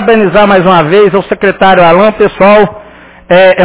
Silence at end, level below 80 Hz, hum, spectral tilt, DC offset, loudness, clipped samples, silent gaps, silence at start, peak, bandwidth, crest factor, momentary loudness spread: 0 s; -36 dBFS; none; -9.5 dB/octave; under 0.1%; -6 LUFS; 6%; none; 0 s; 0 dBFS; 4 kHz; 6 dB; 5 LU